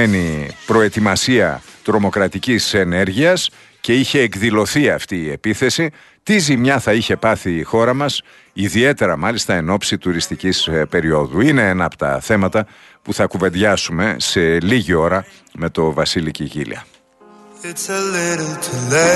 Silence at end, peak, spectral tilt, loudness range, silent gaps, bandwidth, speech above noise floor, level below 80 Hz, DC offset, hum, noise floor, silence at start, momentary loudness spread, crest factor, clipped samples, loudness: 0 s; -2 dBFS; -4.5 dB/octave; 3 LU; none; 12.5 kHz; 29 dB; -44 dBFS; under 0.1%; none; -46 dBFS; 0 s; 10 LU; 16 dB; under 0.1%; -16 LUFS